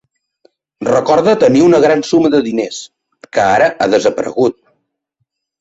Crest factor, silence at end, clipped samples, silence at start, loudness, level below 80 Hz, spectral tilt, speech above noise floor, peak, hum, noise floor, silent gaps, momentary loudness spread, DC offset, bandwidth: 12 dB; 1.1 s; under 0.1%; 0.8 s; -12 LUFS; -52 dBFS; -5.5 dB/octave; 59 dB; 0 dBFS; none; -70 dBFS; none; 11 LU; under 0.1%; 8 kHz